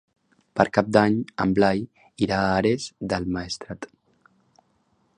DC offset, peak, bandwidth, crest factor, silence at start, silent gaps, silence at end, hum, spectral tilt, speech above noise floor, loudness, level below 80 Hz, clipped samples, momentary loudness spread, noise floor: under 0.1%; -2 dBFS; 10.5 kHz; 24 dB; 0.55 s; none; 1.35 s; none; -6 dB/octave; 44 dB; -23 LUFS; -50 dBFS; under 0.1%; 15 LU; -67 dBFS